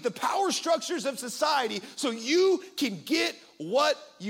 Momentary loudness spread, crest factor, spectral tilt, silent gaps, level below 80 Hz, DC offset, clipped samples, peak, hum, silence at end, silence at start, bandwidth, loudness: 7 LU; 16 dB; -2.5 dB/octave; none; -80 dBFS; under 0.1%; under 0.1%; -12 dBFS; none; 0 s; 0 s; 17.5 kHz; -27 LUFS